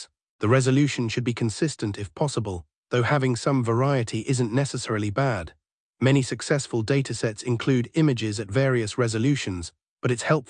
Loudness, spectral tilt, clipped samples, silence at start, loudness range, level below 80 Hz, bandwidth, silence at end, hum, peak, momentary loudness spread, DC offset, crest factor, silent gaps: -25 LUFS; -6 dB/octave; under 0.1%; 0 s; 1 LU; -58 dBFS; 10.5 kHz; 0.05 s; none; -8 dBFS; 9 LU; under 0.1%; 16 dB; 0.29-0.39 s, 2.77-2.83 s, 5.72-5.94 s, 9.89-9.97 s